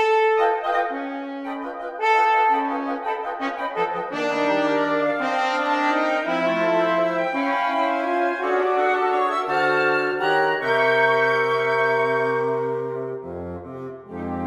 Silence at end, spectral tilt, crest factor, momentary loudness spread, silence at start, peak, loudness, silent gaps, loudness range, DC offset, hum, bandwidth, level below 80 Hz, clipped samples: 0 s; -5.5 dB/octave; 14 dB; 12 LU; 0 s; -6 dBFS; -21 LUFS; none; 3 LU; under 0.1%; none; 11.5 kHz; -62 dBFS; under 0.1%